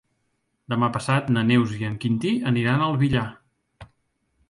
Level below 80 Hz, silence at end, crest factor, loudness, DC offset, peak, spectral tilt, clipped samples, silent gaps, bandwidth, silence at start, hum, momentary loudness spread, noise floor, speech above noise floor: -52 dBFS; 0.65 s; 16 dB; -23 LUFS; under 0.1%; -8 dBFS; -7 dB/octave; under 0.1%; none; 11.5 kHz; 0.7 s; none; 7 LU; -73 dBFS; 51 dB